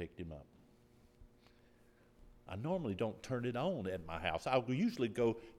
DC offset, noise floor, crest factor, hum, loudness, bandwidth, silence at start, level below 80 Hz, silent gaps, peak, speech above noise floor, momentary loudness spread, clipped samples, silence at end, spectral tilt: under 0.1%; -67 dBFS; 22 dB; none; -39 LUFS; 14.5 kHz; 0 s; -64 dBFS; none; -18 dBFS; 28 dB; 14 LU; under 0.1%; 0 s; -6.5 dB/octave